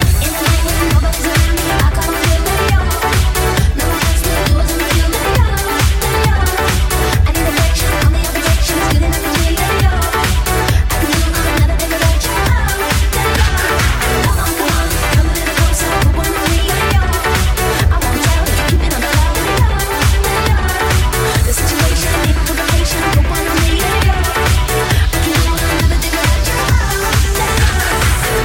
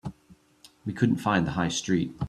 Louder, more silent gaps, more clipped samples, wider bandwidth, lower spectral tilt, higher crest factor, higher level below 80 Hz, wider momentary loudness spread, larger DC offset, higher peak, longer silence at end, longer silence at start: first, -13 LUFS vs -26 LUFS; neither; neither; first, 17 kHz vs 13.5 kHz; about the same, -4 dB/octave vs -5 dB/octave; second, 12 dB vs 18 dB; first, -16 dBFS vs -54 dBFS; second, 1 LU vs 14 LU; neither; first, 0 dBFS vs -10 dBFS; about the same, 0 s vs 0 s; about the same, 0 s vs 0.05 s